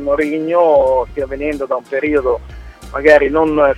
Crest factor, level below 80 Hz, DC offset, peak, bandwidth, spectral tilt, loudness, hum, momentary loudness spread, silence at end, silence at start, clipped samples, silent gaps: 14 dB; -36 dBFS; under 0.1%; 0 dBFS; 11 kHz; -6.5 dB/octave; -14 LUFS; none; 10 LU; 0 s; 0 s; under 0.1%; none